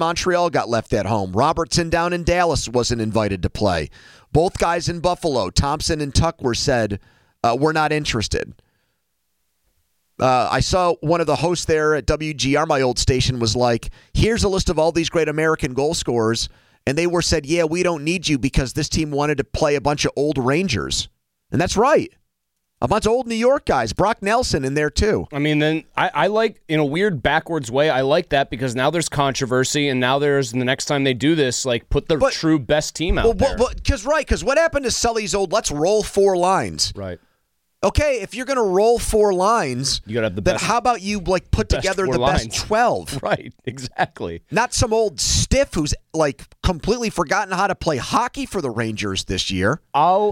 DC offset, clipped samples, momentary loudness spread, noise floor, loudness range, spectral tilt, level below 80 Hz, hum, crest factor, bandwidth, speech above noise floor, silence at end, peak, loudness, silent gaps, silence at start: under 0.1%; under 0.1%; 6 LU; -76 dBFS; 2 LU; -4.5 dB/octave; -34 dBFS; none; 14 dB; 16.5 kHz; 57 dB; 0 s; -4 dBFS; -19 LUFS; none; 0 s